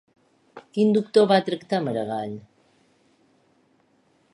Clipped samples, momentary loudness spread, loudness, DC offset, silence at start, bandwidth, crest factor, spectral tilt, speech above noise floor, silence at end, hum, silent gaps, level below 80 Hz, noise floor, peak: under 0.1%; 15 LU; -23 LUFS; under 0.1%; 0.55 s; 11 kHz; 20 dB; -6.5 dB/octave; 42 dB; 1.95 s; none; none; -72 dBFS; -64 dBFS; -4 dBFS